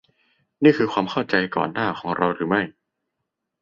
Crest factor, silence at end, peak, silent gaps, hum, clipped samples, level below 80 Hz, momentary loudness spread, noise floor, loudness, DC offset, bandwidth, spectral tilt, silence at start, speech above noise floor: 20 dB; 0.9 s; -2 dBFS; none; none; under 0.1%; -60 dBFS; 7 LU; -80 dBFS; -22 LUFS; under 0.1%; 7.2 kHz; -7 dB/octave; 0.6 s; 59 dB